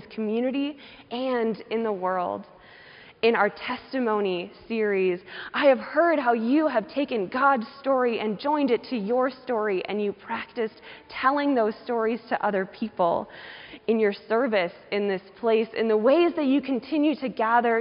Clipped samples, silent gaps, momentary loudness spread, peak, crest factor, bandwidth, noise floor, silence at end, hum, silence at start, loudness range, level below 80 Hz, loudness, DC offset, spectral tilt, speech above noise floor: under 0.1%; none; 10 LU; -8 dBFS; 18 dB; 5.4 kHz; -49 dBFS; 0 s; none; 0 s; 4 LU; -68 dBFS; -25 LUFS; under 0.1%; -3.5 dB/octave; 24 dB